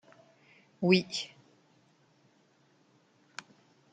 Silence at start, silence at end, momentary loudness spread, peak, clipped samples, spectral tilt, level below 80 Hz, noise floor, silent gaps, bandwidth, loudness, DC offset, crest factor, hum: 0.8 s; 2.65 s; 22 LU; -10 dBFS; under 0.1%; -5.5 dB/octave; -78 dBFS; -67 dBFS; none; 9.2 kHz; -30 LUFS; under 0.1%; 26 dB; none